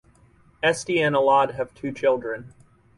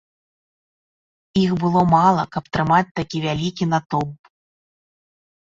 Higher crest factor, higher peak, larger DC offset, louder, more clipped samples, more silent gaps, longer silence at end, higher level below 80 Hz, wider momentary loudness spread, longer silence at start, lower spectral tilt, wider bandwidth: about the same, 16 dB vs 18 dB; second, -8 dBFS vs -2 dBFS; neither; second, -22 LUFS vs -19 LUFS; neither; second, none vs 2.91-2.95 s, 3.86-3.90 s; second, 0.5 s vs 1.45 s; second, -60 dBFS vs -50 dBFS; about the same, 12 LU vs 10 LU; second, 0.65 s vs 1.35 s; second, -4.5 dB/octave vs -6.5 dB/octave; first, 11.5 kHz vs 7.6 kHz